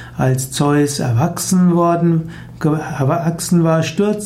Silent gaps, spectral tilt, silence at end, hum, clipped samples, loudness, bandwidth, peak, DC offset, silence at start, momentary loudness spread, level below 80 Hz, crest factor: none; -6 dB/octave; 0 s; none; under 0.1%; -16 LUFS; 15.5 kHz; -4 dBFS; under 0.1%; 0 s; 5 LU; -46 dBFS; 12 dB